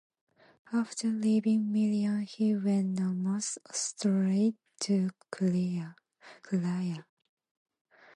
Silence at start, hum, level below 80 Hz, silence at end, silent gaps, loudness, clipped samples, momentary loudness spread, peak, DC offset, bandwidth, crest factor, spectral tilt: 0.7 s; none; -78 dBFS; 1.15 s; none; -31 LUFS; under 0.1%; 7 LU; -18 dBFS; under 0.1%; 11.5 kHz; 12 dB; -6 dB/octave